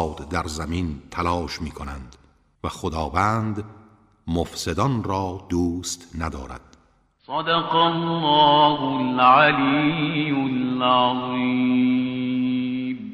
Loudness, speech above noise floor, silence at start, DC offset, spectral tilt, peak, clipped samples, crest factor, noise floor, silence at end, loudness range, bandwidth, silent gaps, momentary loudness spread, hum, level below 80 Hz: -21 LUFS; 38 dB; 0 s; under 0.1%; -5 dB/octave; -2 dBFS; under 0.1%; 20 dB; -60 dBFS; 0 s; 9 LU; 13.5 kHz; none; 16 LU; none; -42 dBFS